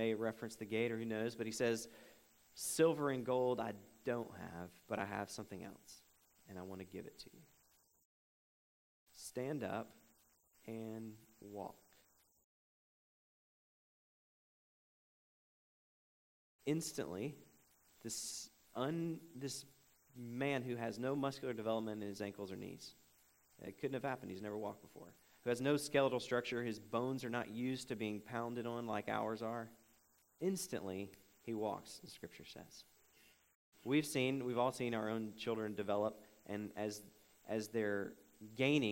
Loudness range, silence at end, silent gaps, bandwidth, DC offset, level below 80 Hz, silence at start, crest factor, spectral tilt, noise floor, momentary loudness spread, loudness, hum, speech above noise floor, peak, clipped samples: 12 LU; 0 s; 8.05-9.07 s, 12.44-16.59 s, 33.55-33.72 s; 16 kHz; under 0.1%; -80 dBFS; 0 s; 22 dB; -5 dB/octave; -74 dBFS; 18 LU; -42 LUFS; none; 33 dB; -20 dBFS; under 0.1%